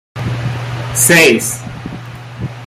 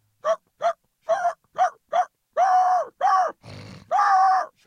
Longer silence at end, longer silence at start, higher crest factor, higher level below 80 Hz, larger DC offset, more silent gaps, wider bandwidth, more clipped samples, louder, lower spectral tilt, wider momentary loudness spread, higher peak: second, 0 s vs 0.2 s; about the same, 0.15 s vs 0.25 s; about the same, 16 dB vs 14 dB; first, -42 dBFS vs -70 dBFS; neither; neither; first, over 20 kHz vs 9.6 kHz; neither; first, -12 LUFS vs -23 LUFS; about the same, -3.5 dB/octave vs -3 dB/octave; first, 21 LU vs 10 LU; first, 0 dBFS vs -8 dBFS